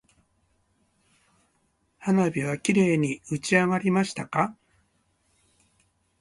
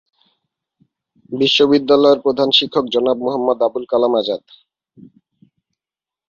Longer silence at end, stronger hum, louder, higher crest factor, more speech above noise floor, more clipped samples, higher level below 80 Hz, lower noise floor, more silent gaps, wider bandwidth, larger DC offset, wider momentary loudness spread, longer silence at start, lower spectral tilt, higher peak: second, 1.65 s vs 1.9 s; neither; second, -25 LUFS vs -15 LUFS; about the same, 22 dB vs 18 dB; second, 46 dB vs 74 dB; neither; about the same, -64 dBFS vs -62 dBFS; second, -70 dBFS vs -89 dBFS; neither; first, 11.5 kHz vs 7.4 kHz; neither; about the same, 7 LU vs 7 LU; first, 2 s vs 1.3 s; about the same, -6 dB/octave vs -5 dB/octave; second, -6 dBFS vs 0 dBFS